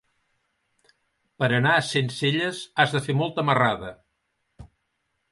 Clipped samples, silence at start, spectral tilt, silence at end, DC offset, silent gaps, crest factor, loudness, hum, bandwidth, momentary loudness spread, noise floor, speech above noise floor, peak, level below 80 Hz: under 0.1%; 1.4 s; -5 dB/octave; 0.65 s; under 0.1%; none; 22 dB; -23 LUFS; none; 11.5 kHz; 7 LU; -75 dBFS; 52 dB; -4 dBFS; -60 dBFS